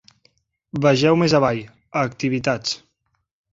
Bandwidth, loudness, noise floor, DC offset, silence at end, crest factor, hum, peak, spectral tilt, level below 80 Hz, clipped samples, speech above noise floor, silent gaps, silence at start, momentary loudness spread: 7.8 kHz; -20 LUFS; -72 dBFS; under 0.1%; 0.75 s; 20 dB; none; -2 dBFS; -5.5 dB/octave; -54 dBFS; under 0.1%; 53 dB; none; 0.75 s; 13 LU